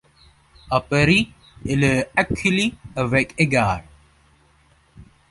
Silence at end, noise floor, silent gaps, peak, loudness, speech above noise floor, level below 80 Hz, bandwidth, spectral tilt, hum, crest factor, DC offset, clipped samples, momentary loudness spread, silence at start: 0.3 s; -57 dBFS; none; -2 dBFS; -20 LUFS; 37 dB; -42 dBFS; 11.5 kHz; -5.5 dB/octave; none; 20 dB; under 0.1%; under 0.1%; 9 LU; 0.65 s